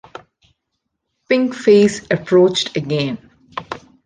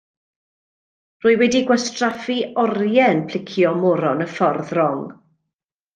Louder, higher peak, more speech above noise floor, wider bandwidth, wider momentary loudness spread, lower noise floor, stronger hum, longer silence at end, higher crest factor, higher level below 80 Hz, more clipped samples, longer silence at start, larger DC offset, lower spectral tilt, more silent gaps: first, -16 LUFS vs -19 LUFS; about the same, -2 dBFS vs -4 dBFS; second, 60 dB vs 64 dB; about the same, 9.8 kHz vs 9.4 kHz; first, 19 LU vs 7 LU; second, -75 dBFS vs -83 dBFS; neither; second, 0.25 s vs 0.85 s; about the same, 16 dB vs 16 dB; first, -56 dBFS vs -64 dBFS; neither; about the same, 1.3 s vs 1.25 s; neither; about the same, -5.5 dB/octave vs -5 dB/octave; neither